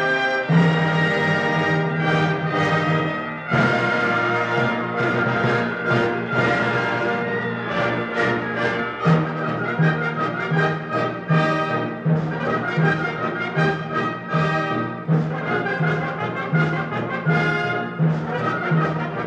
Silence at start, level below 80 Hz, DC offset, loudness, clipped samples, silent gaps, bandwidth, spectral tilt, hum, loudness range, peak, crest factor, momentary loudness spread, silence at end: 0 s; -56 dBFS; under 0.1%; -21 LUFS; under 0.1%; none; 8 kHz; -7 dB/octave; none; 2 LU; -6 dBFS; 16 dB; 5 LU; 0 s